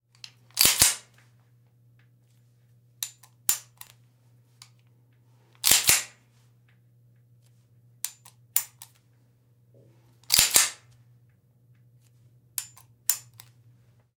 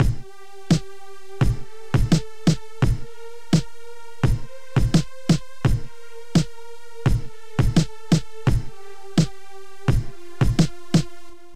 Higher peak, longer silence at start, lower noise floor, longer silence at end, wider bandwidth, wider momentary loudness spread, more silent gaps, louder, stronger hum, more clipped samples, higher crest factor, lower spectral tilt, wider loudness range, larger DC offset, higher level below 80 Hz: first, 0 dBFS vs -6 dBFS; first, 0.55 s vs 0 s; first, -62 dBFS vs -45 dBFS; first, 1 s vs 0 s; first, 18 kHz vs 14.5 kHz; second, 19 LU vs 22 LU; neither; about the same, -23 LUFS vs -24 LUFS; neither; neither; first, 32 dB vs 16 dB; second, 1 dB/octave vs -6.5 dB/octave; first, 10 LU vs 1 LU; second, under 0.1% vs 4%; second, -60 dBFS vs -30 dBFS